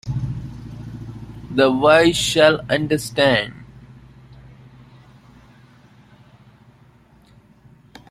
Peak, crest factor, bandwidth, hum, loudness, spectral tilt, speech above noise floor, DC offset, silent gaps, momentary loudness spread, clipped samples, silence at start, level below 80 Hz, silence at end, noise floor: -2 dBFS; 20 dB; 15 kHz; none; -17 LUFS; -4.5 dB/octave; 35 dB; under 0.1%; none; 22 LU; under 0.1%; 0.05 s; -46 dBFS; 4.45 s; -51 dBFS